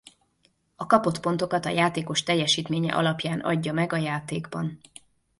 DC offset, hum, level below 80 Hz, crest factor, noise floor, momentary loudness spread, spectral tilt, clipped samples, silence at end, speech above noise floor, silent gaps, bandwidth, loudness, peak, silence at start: under 0.1%; none; -62 dBFS; 22 dB; -68 dBFS; 10 LU; -4.5 dB/octave; under 0.1%; 0.65 s; 42 dB; none; 11.5 kHz; -25 LUFS; -4 dBFS; 0.8 s